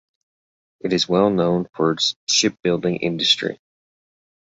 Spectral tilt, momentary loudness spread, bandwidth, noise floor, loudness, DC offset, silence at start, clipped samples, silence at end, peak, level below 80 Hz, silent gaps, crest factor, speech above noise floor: -3.5 dB/octave; 6 LU; 8 kHz; under -90 dBFS; -19 LUFS; under 0.1%; 0.85 s; under 0.1%; 0.95 s; -2 dBFS; -58 dBFS; 2.16-2.27 s; 20 dB; over 70 dB